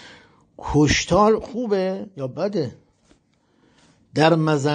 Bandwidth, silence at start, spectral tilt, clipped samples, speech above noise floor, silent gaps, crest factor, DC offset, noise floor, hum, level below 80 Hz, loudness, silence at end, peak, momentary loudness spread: 9.4 kHz; 0.05 s; -5.5 dB/octave; under 0.1%; 43 dB; none; 18 dB; under 0.1%; -62 dBFS; none; -44 dBFS; -20 LUFS; 0 s; -4 dBFS; 13 LU